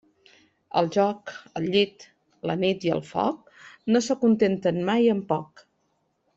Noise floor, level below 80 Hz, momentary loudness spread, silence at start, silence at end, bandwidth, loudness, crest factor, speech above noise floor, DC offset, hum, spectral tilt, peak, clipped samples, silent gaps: -72 dBFS; -66 dBFS; 11 LU; 0.75 s; 0.9 s; 7.8 kHz; -25 LUFS; 18 dB; 48 dB; under 0.1%; none; -6 dB/octave; -8 dBFS; under 0.1%; none